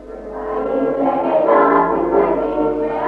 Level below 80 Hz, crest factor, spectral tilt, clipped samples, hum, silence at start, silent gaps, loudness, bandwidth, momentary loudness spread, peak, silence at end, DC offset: -44 dBFS; 14 dB; -8.5 dB/octave; under 0.1%; none; 0 s; none; -16 LUFS; 5.2 kHz; 11 LU; -2 dBFS; 0 s; under 0.1%